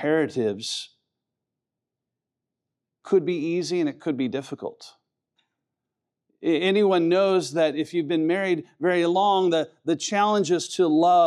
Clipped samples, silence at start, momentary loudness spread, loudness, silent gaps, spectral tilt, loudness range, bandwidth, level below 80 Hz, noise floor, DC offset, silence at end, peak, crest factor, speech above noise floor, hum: under 0.1%; 0 s; 10 LU; -23 LUFS; none; -5 dB/octave; 8 LU; 11.5 kHz; -84 dBFS; -86 dBFS; under 0.1%; 0 s; -8 dBFS; 16 dB; 64 dB; none